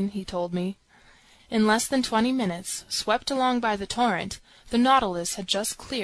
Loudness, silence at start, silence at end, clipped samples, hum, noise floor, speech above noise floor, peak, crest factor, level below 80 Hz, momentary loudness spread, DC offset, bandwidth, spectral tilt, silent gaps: -25 LUFS; 0 s; 0 s; under 0.1%; none; -56 dBFS; 31 dB; -8 dBFS; 18 dB; -52 dBFS; 9 LU; under 0.1%; 13.5 kHz; -3.5 dB/octave; none